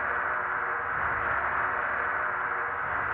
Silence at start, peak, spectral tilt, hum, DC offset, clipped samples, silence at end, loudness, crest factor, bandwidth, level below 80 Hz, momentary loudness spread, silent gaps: 0 s; -16 dBFS; -2.5 dB/octave; none; under 0.1%; under 0.1%; 0 s; -28 LUFS; 14 dB; 4.4 kHz; -54 dBFS; 2 LU; none